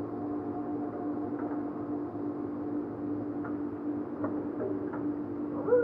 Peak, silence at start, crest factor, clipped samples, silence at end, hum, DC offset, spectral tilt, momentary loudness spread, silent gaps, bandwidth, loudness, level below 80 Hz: -14 dBFS; 0 s; 18 dB; under 0.1%; 0 s; none; under 0.1%; -11 dB/octave; 2 LU; none; 2.9 kHz; -35 LUFS; -66 dBFS